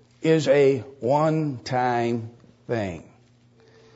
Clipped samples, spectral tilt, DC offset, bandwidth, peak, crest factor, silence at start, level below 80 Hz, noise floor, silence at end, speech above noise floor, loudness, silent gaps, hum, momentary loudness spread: under 0.1%; -6.5 dB/octave; under 0.1%; 8 kHz; -8 dBFS; 16 dB; 0.2 s; -64 dBFS; -56 dBFS; 0.95 s; 34 dB; -23 LUFS; none; none; 13 LU